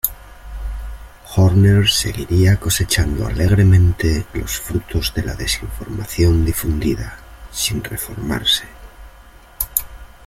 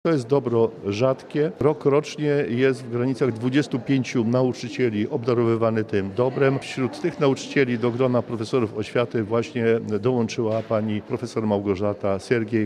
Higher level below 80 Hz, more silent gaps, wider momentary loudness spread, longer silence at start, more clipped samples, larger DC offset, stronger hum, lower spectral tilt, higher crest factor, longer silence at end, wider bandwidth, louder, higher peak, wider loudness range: first, -30 dBFS vs -62 dBFS; neither; first, 18 LU vs 4 LU; about the same, 0.05 s vs 0.05 s; neither; neither; neither; second, -4.5 dB/octave vs -7 dB/octave; about the same, 18 dB vs 16 dB; first, 0.2 s vs 0 s; first, 16.5 kHz vs 11 kHz; first, -17 LUFS vs -23 LUFS; first, 0 dBFS vs -6 dBFS; first, 7 LU vs 2 LU